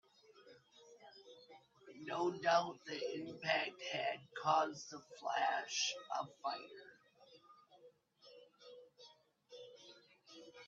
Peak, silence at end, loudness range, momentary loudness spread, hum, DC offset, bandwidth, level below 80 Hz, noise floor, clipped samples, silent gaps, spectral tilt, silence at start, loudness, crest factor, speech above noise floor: -18 dBFS; 0 s; 22 LU; 26 LU; none; under 0.1%; 7.8 kHz; under -90 dBFS; -67 dBFS; under 0.1%; none; -2.5 dB/octave; 0.4 s; -40 LUFS; 24 dB; 27 dB